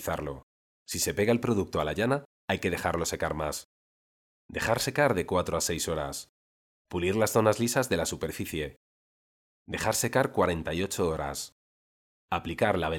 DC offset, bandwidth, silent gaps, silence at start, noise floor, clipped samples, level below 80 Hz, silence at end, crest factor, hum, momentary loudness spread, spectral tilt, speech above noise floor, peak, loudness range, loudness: under 0.1%; 18 kHz; 0.43-0.86 s, 2.25-2.48 s, 3.65-4.49 s, 6.29-6.85 s, 8.76-9.66 s, 11.52-12.28 s; 0 s; under -90 dBFS; under 0.1%; -54 dBFS; 0 s; 20 dB; none; 11 LU; -4 dB/octave; over 61 dB; -8 dBFS; 2 LU; -29 LUFS